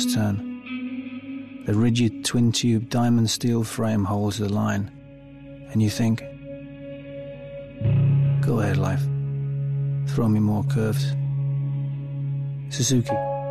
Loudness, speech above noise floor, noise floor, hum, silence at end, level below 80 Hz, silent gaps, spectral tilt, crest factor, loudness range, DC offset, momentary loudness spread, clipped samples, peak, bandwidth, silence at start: -24 LUFS; 21 dB; -43 dBFS; 50 Hz at -50 dBFS; 0 s; -50 dBFS; none; -6 dB/octave; 12 dB; 4 LU; under 0.1%; 16 LU; under 0.1%; -10 dBFS; 13.5 kHz; 0 s